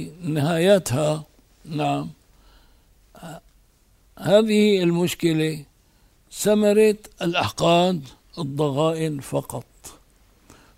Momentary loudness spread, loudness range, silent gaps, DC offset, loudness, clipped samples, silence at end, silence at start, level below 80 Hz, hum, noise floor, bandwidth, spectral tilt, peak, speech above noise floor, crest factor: 18 LU; 6 LU; none; under 0.1%; -21 LUFS; under 0.1%; 0.85 s; 0 s; -56 dBFS; none; -58 dBFS; 16 kHz; -5.5 dB/octave; -4 dBFS; 37 dB; 20 dB